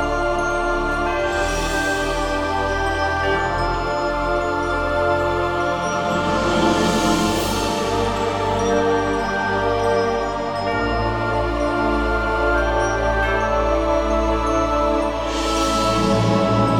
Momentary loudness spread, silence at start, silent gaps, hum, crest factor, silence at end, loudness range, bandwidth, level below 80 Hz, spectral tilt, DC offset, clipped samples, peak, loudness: 4 LU; 0 s; none; none; 14 dB; 0 s; 2 LU; 19 kHz; -30 dBFS; -5 dB/octave; 0.3%; under 0.1%; -6 dBFS; -20 LUFS